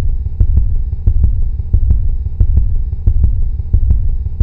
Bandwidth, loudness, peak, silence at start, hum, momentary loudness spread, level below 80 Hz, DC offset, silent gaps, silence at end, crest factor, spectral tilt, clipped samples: 1.1 kHz; -17 LUFS; 0 dBFS; 0 s; none; 5 LU; -12 dBFS; 0.7%; none; 0 s; 12 dB; -12.5 dB/octave; 0.1%